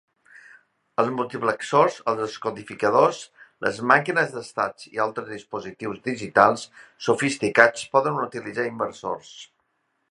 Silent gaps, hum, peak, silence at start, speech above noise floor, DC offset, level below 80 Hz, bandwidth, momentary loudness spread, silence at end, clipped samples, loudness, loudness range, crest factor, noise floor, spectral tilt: none; none; 0 dBFS; 1 s; 49 dB; under 0.1%; -68 dBFS; 11.5 kHz; 15 LU; 0.65 s; under 0.1%; -23 LUFS; 3 LU; 24 dB; -73 dBFS; -4.5 dB/octave